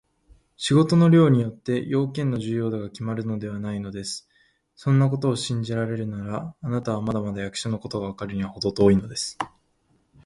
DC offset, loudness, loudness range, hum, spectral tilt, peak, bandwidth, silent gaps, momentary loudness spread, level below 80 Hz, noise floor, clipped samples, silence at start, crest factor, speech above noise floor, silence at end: under 0.1%; -24 LUFS; 6 LU; none; -6.5 dB/octave; -4 dBFS; 11.5 kHz; none; 13 LU; -52 dBFS; -66 dBFS; under 0.1%; 0.6 s; 20 dB; 43 dB; 0.8 s